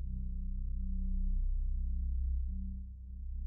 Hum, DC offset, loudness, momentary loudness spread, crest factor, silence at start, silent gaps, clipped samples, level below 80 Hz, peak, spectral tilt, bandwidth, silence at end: none; under 0.1%; -40 LUFS; 8 LU; 10 dB; 0 s; none; under 0.1%; -34 dBFS; -26 dBFS; -23.5 dB/octave; 0.5 kHz; 0 s